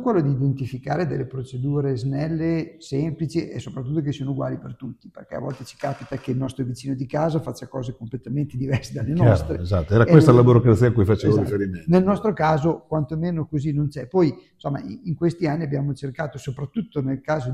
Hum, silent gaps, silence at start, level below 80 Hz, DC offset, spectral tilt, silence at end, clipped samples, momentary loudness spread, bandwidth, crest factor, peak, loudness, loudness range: none; none; 0 s; -46 dBFS; under 0.1%; -8.5 dB/octave; 0 s; under 0.1%; 14 LU; 11.5 kHz; 22 dB; 0 dBFS; -22 LUFS; 11 LU